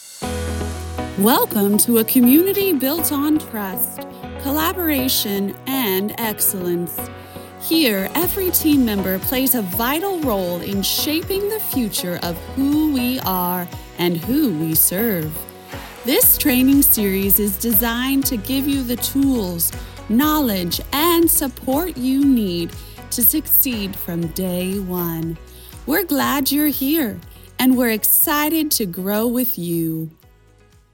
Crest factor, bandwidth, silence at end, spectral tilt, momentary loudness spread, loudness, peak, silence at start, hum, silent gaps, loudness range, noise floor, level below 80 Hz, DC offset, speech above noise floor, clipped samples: 18 dB; 19 kHz; 0.85 s; -4 dB/octave; 13 LU; -18 LUFS; -2 dBFS; 0 s; none; none; 5 LU; -51 dBFS; -40 dBFS; under 0.1%; 33 dB; under 0.1%